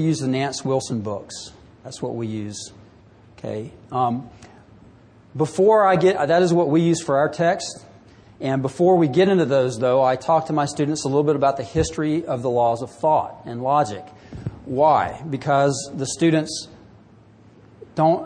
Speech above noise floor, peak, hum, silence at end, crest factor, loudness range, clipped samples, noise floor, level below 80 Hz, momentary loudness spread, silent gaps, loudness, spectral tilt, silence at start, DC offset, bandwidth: 29 dB; -6 dBFS; none; 0 s; 16 dB; 10 LU; under 0.1%; -49 dBFS; -52 dBFS; 16 LU; none; -20 LUFS; -6 dB/octave; 0 s; under 0.1%; 10 kHz